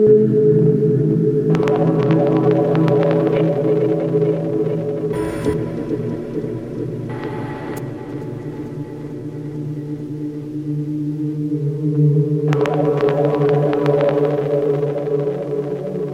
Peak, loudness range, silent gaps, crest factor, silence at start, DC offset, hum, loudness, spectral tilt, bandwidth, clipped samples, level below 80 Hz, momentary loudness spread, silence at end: -2 dBFS; 11 LU; none; 14 dB; 0 s; under 0.1%; none; -18 LUFS; -9.5 dB/octave; 9.8 kHz; under 0.1%; -48 dBFS; 12 LU; 0 s